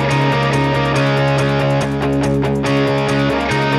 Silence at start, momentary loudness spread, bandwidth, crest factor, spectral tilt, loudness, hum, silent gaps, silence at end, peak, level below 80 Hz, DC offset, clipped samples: 0 s; 2 LU; 12 kHz; 10 dB; -6.5 dB/octave; -16 LUFS; none; none; 0 s; -4 dBFS; -36 dBFS; under 0.1%; under 0.1%